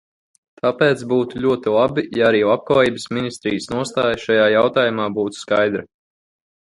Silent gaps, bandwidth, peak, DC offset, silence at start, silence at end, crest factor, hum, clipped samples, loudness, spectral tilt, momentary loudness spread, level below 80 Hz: none; 11.5 kHz; -2 dBFS; under 0.1%; 0.65 s; 0.8 s; 16 dB; none; under 0.1%; -18 LUFS; -5.5 dB/octave; 8 LU; -54 dBFS